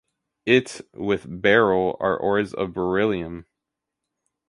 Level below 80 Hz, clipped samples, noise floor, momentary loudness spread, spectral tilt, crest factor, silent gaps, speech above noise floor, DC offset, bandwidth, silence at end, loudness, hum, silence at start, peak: -54 dBFS; under 0.1%; -84 dBFS; 14 LU; -5.5 dB/octave; 22 dB; none; 62 dB; under 0.1%; 11.5 kHz; 1.05 s; -22 LUFS; none; 0.45 s; -2 dBFS